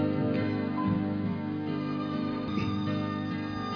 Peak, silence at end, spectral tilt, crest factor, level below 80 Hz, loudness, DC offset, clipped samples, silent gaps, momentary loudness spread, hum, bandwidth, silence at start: -16 dBFS; 0 s; -8.5 dB/octave; 14 dB; -58 dBFS; -31 LUFS; under 0.1%; under 0.1%; none; 4 LU; 50 Hz at -45 dBFS; 5.4 kHz; 0 s